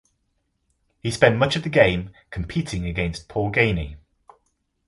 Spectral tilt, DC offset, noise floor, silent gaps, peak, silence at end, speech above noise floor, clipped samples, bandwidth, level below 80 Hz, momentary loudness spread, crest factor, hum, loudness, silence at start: -5.5 dB/octave; under 0.1%; -72 dBFS; none; 0 dBFS; 0.9 s; 50 dB; under 0.1%; 11.5 kHz; -40 dBFS; 14 LU; 24 dB; none; -22 LUFS; 1.05 s